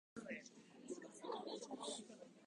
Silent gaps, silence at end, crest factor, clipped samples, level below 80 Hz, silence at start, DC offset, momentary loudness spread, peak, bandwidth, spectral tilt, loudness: none; 0 s; 18 dB; under 0.1%; -90 dBFS; 0.15 s; under 0.1%; 11 LU; -36 dBFS; 11 kHz; -3 dB/octave; -51 LUFS